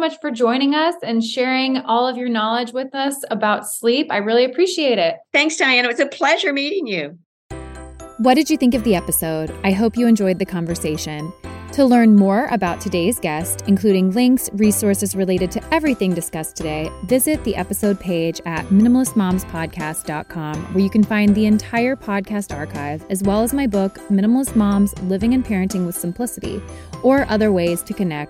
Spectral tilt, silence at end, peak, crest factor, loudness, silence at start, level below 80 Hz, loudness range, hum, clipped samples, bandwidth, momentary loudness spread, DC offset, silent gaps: -5 dB/octave; 0 s; 0 dBFS; 18 dB; -18 LUFS; 0 s; -42 dBFS; 3 LU; none; under 0.1%; 16.5 kHz; 11 LU; under 0.1%; 7.26-7.50 s